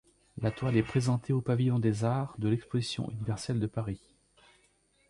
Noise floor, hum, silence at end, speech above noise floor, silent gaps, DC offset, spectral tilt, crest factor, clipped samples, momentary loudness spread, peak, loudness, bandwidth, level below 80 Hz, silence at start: -69 dBFS; none; 1.15 s; 39 dB; none; under 0.1%; -7 dB/octave; 18 dB; under 0.1%; 7 LU; -14 dBFS; -31 LUFS; 11.5 kHz; -58 dBFS; 0.35 s